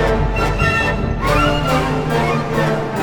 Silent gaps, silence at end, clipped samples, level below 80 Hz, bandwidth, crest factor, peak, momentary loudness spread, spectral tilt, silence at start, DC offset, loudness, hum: none; 0 s; under 0.1%; -24 dBFS; 19 kHz; 14 dB; -2 dBFS; 3 LU; -6 dB/octave; 0 s; under 0.1%; -17 LUFS; none